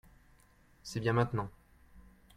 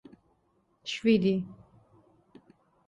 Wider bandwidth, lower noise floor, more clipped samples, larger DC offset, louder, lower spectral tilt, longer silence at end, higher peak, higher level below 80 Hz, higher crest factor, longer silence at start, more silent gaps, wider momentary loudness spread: first, 13.5 kHz vs 8 kHz; second, -64 dBFS vs -71 dBFS; neither; neither; second, -34 LUFS vs -27 LUFS; about the same, -6.5 dB/octave vs -6.5 dB/octave; second, 0.35 s vs 1.35 s; second, -16 dBFS vs -12 dBFS; first, -60 dBFS vs -68 dBFS; about the same, 22 dB vs 20 dB; about the same, 0.85 s vs 0.85 s; neither; second, 15 LU vs 18 LU